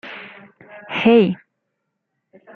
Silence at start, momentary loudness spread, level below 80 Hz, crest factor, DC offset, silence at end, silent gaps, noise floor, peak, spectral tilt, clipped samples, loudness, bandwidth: 0.05 s; 22 LU; -64 dBFS; 20 dB; under 0.1%; 1.2 s; none; -76 dBFS; -2 dBFS; -8 dB/octave; under 0.1%; -16 LUFS; 6.2 kHz